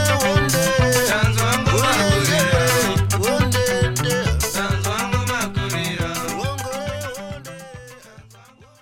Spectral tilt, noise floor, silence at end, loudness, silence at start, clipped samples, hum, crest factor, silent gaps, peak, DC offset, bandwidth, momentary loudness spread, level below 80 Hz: -4 dB/octave; -47 dBFS; 0.6 s; -19 LUFS; 0 s; under 0.1%; none; 18 dB; none; -2 dBFS; under 0.1%; 18 kHz; 13 LU; -34 dBFS